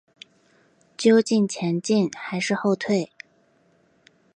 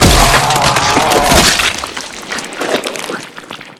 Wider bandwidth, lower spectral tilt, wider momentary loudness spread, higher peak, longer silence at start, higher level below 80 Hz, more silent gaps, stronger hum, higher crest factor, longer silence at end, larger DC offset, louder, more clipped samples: second, 9.6 kHz vs 20 kHz; first, -5.5 dB/octave vs -2.5 dB/octave; second, 8 LU vs 16 LU; second, -6 dBFS vs 0 dBFS; first, 1 s vs 0 s; second, -74 dBFS vs -24 dBFS; neither; neither; first, 20 dB vs 12 dB; first, 1.3 s vs 0.05 s; neither; second, -22 LUFS vs -11 LUFS; second, under 0.1% vs 0.2%